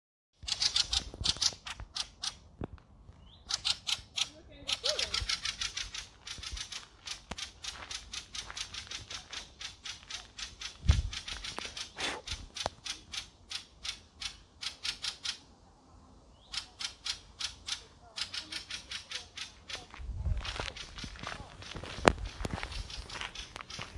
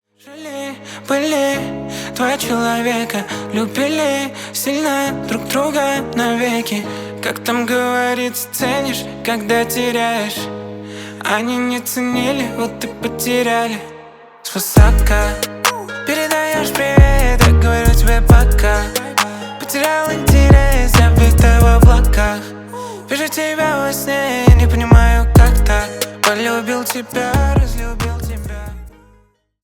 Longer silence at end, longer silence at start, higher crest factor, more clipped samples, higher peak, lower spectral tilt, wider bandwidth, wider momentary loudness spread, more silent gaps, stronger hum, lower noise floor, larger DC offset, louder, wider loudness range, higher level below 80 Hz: second, 0 s vs 0.75 s; first, 0.4 s vs 0.25 s; first, 38 dB vs 14 dB; neither; about the same, 0 dBFS vs 0 dBFS; second, -2.5 dB/octave vs -5 dB/octave; second, 11.5 kHz vs 18.5 kHz; about the same, 13 LU vs 14 LU; neither; neither; first, -59 dBFS vs -53 dBFS; neither; second, -36 LUFS vs -15 LUFS; about the same, 7 LU vs 7 LU; second, -46 dBFS vs -18 dBFS